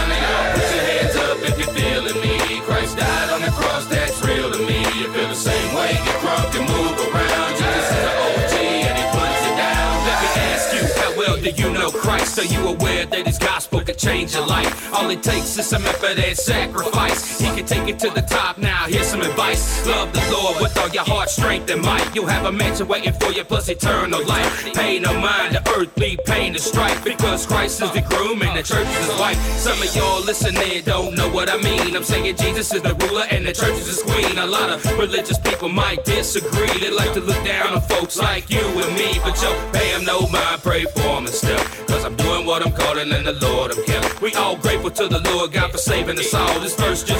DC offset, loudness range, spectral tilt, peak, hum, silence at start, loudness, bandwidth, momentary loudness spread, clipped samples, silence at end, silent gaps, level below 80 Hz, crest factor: under 0.1%; 1 LU; -3.5 dB/octave; -4 dBFS; none; 0 s; -18 LUFS; 18.5 kHz; 2 LU; under 0.1%; 0 s; none; -30 dBFS; 14 dB